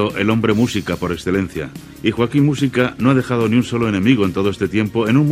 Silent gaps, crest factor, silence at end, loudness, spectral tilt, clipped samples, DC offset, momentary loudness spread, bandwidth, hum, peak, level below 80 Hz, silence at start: none; 16 dB; 0 s; -17 LUFS; -6.5 dB/octave; under 0.1%; under 0.1%; 6 LU; 15.5 kHz; none; 0 dBFS; -46 dBFS; 0 s